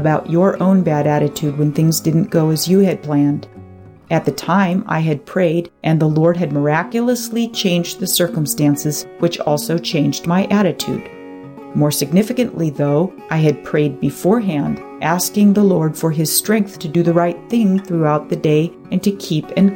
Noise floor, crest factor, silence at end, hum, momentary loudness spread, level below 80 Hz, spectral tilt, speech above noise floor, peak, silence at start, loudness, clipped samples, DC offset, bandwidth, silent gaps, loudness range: -39 dBFS; 14 dB; 0 s; none; 6 LU; -54 dBFS; -5.5 dB/octave; 23 dB; -2 dBFS; 0 s; -16 LUFS; under 0.1%; under 0.1%; 17 kHz; none; 2 LU